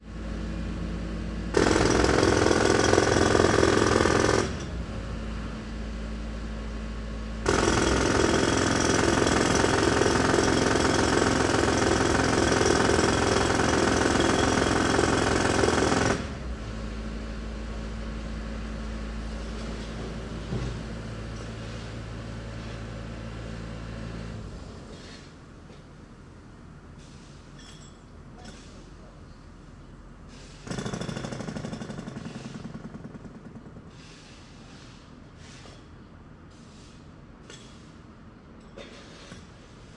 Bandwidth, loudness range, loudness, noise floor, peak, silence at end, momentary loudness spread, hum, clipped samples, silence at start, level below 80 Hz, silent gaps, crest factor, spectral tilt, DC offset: 11.5 kHz; 24 LU; -25 LUFS; -48 dBFS; -4 dBFS; 0 s; 24 LU; none; under 0.1%; 0 s; -40 dBFS; none; 22 dB; -4.5 dB/octave; under 0.1%